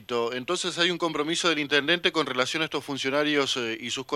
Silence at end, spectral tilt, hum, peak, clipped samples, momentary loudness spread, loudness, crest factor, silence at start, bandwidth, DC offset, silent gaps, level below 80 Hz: 0 s; -3 dB/octave; none; -6 dBFS; under 0.1%; 6 LU; -25 LUFS; 22 dB; 0 s; 14.5 kHz; under 0.1%; none; -70 dBFS